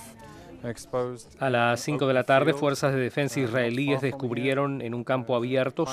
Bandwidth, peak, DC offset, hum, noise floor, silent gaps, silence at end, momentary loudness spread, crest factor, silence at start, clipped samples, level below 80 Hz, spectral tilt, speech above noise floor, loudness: 15.5 kHz; -6 dBFS; under 0.1%; none; -46 dBFS; none; 0 s; 14 LU; 20 dB; 0 s; under 0.1%; -62 dBFS; -5.5 dB/octave; 20 dB; -26 LUFS